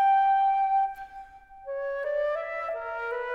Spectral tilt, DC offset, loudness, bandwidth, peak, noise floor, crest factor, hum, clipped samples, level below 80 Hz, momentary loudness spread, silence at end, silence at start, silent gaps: -2.5 dB/octave; under 0.1%; -27 LUFS; 5.2 kHz; -16 dBFS; -46 dBFS; 12 dB; none; under 0.1%; -62 dBFS; 20 LU; 0 s; 0 s; none